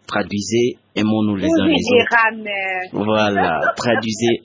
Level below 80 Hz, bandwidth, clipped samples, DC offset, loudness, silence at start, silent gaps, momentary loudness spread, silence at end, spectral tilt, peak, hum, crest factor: -48 dBFS; 7.8 kHz; under 0.1%; under 0.1%; -17 LUFS; 0.1 s; none; 7 LU; 0.05 s; -5 dB/octave; -2 dBFS; none; 16 dB